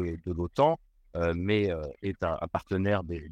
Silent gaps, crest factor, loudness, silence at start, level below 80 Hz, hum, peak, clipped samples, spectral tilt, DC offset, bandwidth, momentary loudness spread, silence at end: none; 18 dB; -30 LUFS; 0 s; -48 dBFS; none; -12 dBFS; under 0.1%; -8 dB/octave; under 0.1%; 8.8 kHz; 8 LU; 0 s